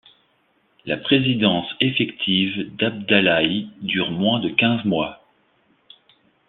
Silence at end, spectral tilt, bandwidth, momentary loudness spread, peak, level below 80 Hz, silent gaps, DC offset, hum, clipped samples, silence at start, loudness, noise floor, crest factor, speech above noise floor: 1.35 s; -8.5 dB/octave; 4.3 kHz; 9 LU; -2 dBFS; -60 dBFS; none; under 0.1%; none; under 0.1%; 0.85 s; -20 LUFS; -64 dBFS; 20 dB; 43 dB